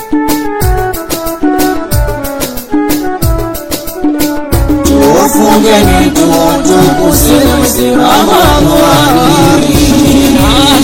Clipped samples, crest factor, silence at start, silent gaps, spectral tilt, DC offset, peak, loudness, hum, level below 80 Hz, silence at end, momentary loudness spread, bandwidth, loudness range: 2%; 8 dB; 0 s; none; -4.5 dB/octave; under 0.1%; 0 dBFS; -8 LUFS; none; -18 dBFS; 0 s; 8 LU; over 20 kHz; 6 LU